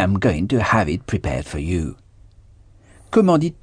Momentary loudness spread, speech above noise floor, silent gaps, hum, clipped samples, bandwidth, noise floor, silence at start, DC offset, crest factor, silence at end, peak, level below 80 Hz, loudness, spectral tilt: 9 LU; 30 dB; none; none; under 0.1%; 10 kHz; -48 dBFS; 0 s; under 0.1%; 16 dB; 0.1 s; -4 dBFS; -36 dBFS; -20 LUFS; -7 dB/octave